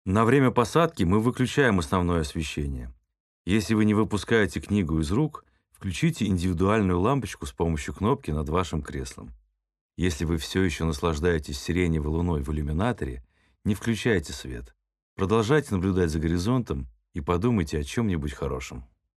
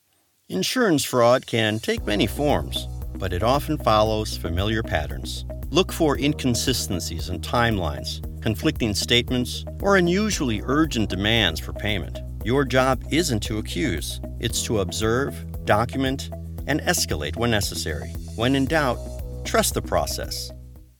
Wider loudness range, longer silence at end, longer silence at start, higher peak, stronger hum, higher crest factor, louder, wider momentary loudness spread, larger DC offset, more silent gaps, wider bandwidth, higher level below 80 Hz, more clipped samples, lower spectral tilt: about the same, 3 LU vs 2 LU; first, 0.35 s vs 0.15 s; second, 0.05 s vs 0.5 s; about the same, -6 dBFS vs -4 dBFS; neither; about the same, 20 dB vs 20 dB; second, -26 LUFS vs -23 LUFS; about the same, 13 LU vs 11 LU; neither; first, 3.20-3.45 s, 9.81-9.89 s, 15.02-15.16 s vs none; second, 13 kHz vs 19 kHz; second, -40 dBFS vs -34 dBFS; neither; first, -6.5 dB/octave vs -4.5 dB/octave